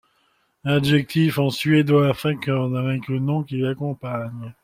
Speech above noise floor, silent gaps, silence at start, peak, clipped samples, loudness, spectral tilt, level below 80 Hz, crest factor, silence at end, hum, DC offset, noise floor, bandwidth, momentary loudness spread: 45 dB; none; 0.65 s; -6 dBFS; under 0.1%; -21 LUFS; -7 dB/octave; -56 dBFS; 16 dB; 0.1 s; none; under 0.1%; -65 dBFS; 16 kHz; 11 LU